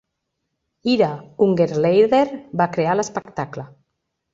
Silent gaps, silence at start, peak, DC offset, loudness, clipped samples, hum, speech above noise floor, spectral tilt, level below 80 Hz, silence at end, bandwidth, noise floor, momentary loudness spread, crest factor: none; 0.85 s; -4 dBFS; under 0.1%; -19 LUFS; under 0.1%; none; 58 dB; -6 dB/octave; -60 dBFS; 0.7 s; 7.8 kHz; -77 dBFS; 13 LU; 16 dB